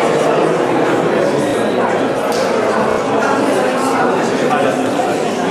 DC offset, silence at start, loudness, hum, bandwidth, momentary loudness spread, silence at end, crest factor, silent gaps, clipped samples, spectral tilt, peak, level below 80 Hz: under 0.1%; 0 s; -15 LUFS; none; 14.5 kHz; 2 LU; 0 s; 14 dB; none; under 0.1%; -5 dB/octave; 0 dBFS; -54 dBFS